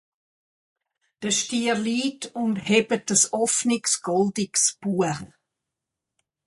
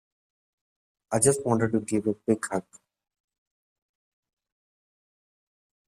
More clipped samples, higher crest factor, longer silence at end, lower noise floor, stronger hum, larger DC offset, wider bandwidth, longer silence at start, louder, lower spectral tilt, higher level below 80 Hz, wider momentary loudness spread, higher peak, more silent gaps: neither; about the same, 20 dB vs 24 dB; second, 1.2 s vs 3.25 s; second, -85 dBFS vs under -90 dBFS; neither; neither; second, 11.5 kHz vs 14 kHz; about the same, 1.2 s vs 1.1 s; first, -23 LUFS vs -26 LUFS; second, -3 dB/octave vs -5.5 dB/octave; about the same, -66 dBFS vs -66 dBFS; about the same, 7 LU vs 9 LU; about the same, -6 dBFS vs -8 dBFS; neither